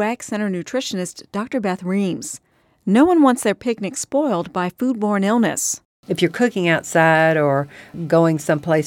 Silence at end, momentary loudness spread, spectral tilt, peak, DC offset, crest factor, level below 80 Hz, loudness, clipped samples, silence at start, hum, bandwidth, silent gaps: 0 s; 13 LU; -5 dB/octave; 0 dBFS; under 0.1%; 18 dB; -60 dBFS; -19 LUFS; under 0.1%; 0 s; none; 17 kHz; 5.85-6.03 s